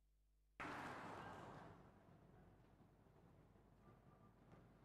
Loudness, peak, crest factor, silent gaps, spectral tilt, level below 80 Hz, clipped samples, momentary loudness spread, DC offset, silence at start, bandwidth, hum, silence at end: -56 LUFS; -38 dBFS; 22 dB; none; -5.5 dB/octave; -78 dBFS; under 0.1%; 17 LU; under 0.1%; 0 s; 13.5 kHz; none; 0 s